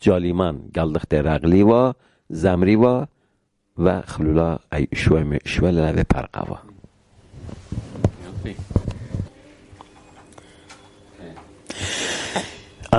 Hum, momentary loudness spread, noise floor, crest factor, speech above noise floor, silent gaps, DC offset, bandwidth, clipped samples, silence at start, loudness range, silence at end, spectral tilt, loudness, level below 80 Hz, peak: none; 20 LU; -68 dBFS; 20 dB; 49 dB; none; under 0.1%; 11.5 kHz; under 0.1%; 0 s; 13 LU; 0 s; -6.5 dB/octave; -21 LUFS; -34 dBFS; -2 dBFS